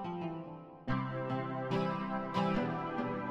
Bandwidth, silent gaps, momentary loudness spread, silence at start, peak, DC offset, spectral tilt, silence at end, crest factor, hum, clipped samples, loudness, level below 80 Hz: 8.8 kHz; none; 9 LU; 0 s; -20 dBFS; under 0.1%; -8 dB/octave; 0 s; 16 dB; none; under 0.1%; -36 LUFS; -58 dBFS